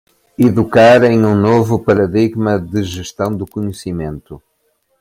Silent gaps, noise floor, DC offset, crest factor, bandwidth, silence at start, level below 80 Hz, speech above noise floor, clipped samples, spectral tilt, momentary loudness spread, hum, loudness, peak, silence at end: none; -63 dBFS; under 0.1%; 14 dB; 16 kHz; 0.4 s; -46 dBFS; 50 dB; under 0.1%; -7 dB/octave; 15 LU; none; -13 LUFS; 0 dBFS; 0.65 s